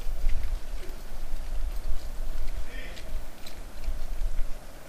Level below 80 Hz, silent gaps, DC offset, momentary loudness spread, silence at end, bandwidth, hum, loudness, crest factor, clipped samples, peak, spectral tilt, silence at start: -30 dBFS; none; under 0.1%; 7 LU; 0 s; 12.5 kHz; none; -39 LUFS; 14 dB; under 0.1%; -10 dBFS; -4.5 dB/octave; 0 s